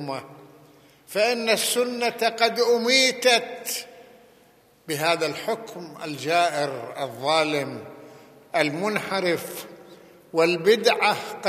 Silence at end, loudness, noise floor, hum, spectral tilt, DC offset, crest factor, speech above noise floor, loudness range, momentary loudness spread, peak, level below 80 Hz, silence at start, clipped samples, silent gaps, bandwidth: 0 s; -23 LUFS; -57 dBFS; none; -2.5 dB/octave; under 0.1%; 22 dB; 33 dB; 6 LU; 16 LU; -2 dBFS; -76 dBFS; 0 s; under 0.1%; none; 15 kHz